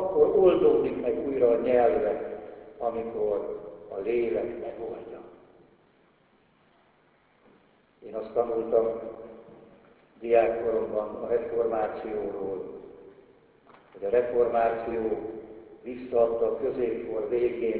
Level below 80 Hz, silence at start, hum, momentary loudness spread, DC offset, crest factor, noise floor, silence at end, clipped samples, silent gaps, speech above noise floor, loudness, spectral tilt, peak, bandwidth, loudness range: -58 dBFS; 0 s; none; 18 LU; under 0.1%; 20 dB; -64 dBFS; 0 s; under 0.1%; none; 37 dB; -27 LUFS; -10 dB/octave; -8 dBFS; 4 kHz; 8 LU